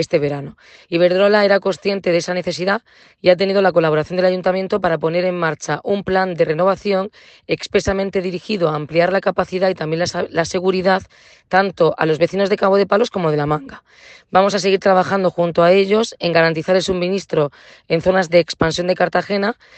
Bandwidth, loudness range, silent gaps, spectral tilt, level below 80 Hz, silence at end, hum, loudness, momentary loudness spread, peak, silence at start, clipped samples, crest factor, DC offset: 8.8 kHz; 3 LU; none; -5.5 dB/octave; -48 dBFS; 0.25 s; none; -17 LUFS; 7 LU; 0 dBFS; 0 s; under 0.1%; 16 dB; under 0.1%